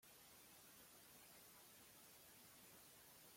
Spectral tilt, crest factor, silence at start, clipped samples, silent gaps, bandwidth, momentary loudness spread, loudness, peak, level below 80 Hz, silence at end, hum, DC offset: -1.5 dB/octave; 14 dB; 0 s; under 0.1%; none; 16.5 kHz; 1 LU; -64 LUFS; -52 dBFS; -88 dBFS; 0 s; none; under 0.1%